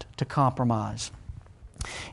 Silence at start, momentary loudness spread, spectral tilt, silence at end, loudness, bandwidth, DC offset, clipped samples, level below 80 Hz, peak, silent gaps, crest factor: 0 s; 21 LU; -6 dB/octave; 0 s; -28 LUFS; 11.5 kHz; under 0.1%; under 0.1%; -46 dBFS; -10 dBFS; none; 18 dB